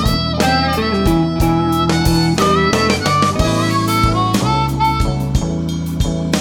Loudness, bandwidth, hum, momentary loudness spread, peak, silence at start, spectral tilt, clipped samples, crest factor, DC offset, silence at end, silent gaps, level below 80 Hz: -15 LUFS; 18 kHz; none; 5 LU; 0 dBFS; 0 s; -5.5 dB/octave; under 0.1%; 14 dB; under 0.1%; 0 s; none; -26 dBFS